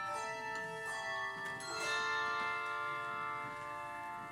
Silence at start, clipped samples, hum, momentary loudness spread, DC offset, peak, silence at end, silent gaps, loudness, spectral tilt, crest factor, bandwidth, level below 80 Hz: 0 s; under 0.1%; none; 8 LU; under 0.1%; -24 dBFS; 0 s; none; -39 LUFS; -2 dB/octave; 16 dB; 16.5 kHz; -74 dBFS